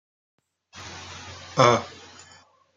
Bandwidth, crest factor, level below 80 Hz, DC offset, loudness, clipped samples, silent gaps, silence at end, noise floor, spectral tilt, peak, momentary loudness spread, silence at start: 9.2 kHz; 26 dB; -68 dBFS; under 0.1%; -21 LUFS; under 0.1%; none; 0.9 s; -55 dBFS; -4.5 dB/octave; -2 dBFS; 24 LU; 0.75 s